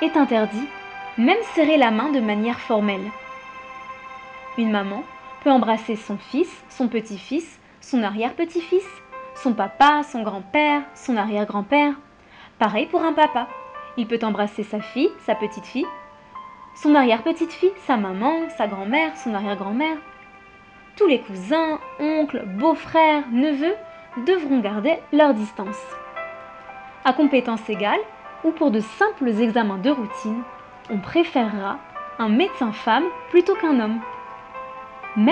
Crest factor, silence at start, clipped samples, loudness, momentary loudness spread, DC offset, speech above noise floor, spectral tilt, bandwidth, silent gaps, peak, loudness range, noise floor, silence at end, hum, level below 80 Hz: 18 dB; 0 s; under 0.1%; -21 LUFS; 18 LU; under 0.1%; 27 dB; -6 dB/octave; 9.4 kHz; none; -4 dBFS; 4 LU; -47 dBFS; 0 s; none; -62 dBFS